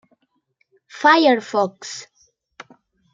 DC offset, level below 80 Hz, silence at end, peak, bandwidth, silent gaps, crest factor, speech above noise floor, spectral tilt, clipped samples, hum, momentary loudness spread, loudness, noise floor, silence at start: under 0.1%; -78 dBFS; 1.1 s; -2 dBFS; 9.2 kHz; none; 20 dB; 50 dB; -3.5 dB/octave; under 0.1%; none; 19 LU; -17 LUFS; -67 dBFS; 0.95 s